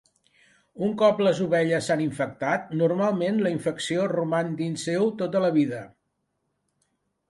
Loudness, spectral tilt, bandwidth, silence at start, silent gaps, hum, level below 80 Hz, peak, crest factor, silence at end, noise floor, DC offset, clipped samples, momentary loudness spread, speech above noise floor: -25 LUFS; -6 dB/octave; 11.5 kHz; 0.75 s; none; none; -68 dBFS; -8 dBFS; 18 dB; 1.45 s; -76 dBFS; under 0.1%; under 0.1%; 7 LU; 52 dB